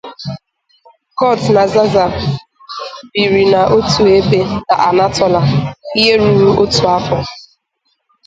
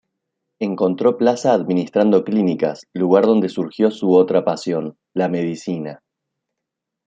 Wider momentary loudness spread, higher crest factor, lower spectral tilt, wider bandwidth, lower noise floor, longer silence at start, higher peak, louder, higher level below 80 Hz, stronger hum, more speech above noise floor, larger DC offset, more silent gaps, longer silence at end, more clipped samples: first, 16 LU vs 11 LU; about the same, 12 dB vs 16 dB; second, -5.5 dB/octave vs -7 dB/octave; about the same, 9.2 kHz vs 8.6 kHz; second, -65 dBFS vs -82 dBFS; second, 0.05 s vs 0.6 s; about the same, 0 dBFS vs -2 dBFS; first, -12 LUFS vs -18 LUFS; first, -40 dBFS vs -66 dBFS; neither; second, 54 dB vs 64 dB; neither; neither; second, 0.85 s vs 1.1 s; neither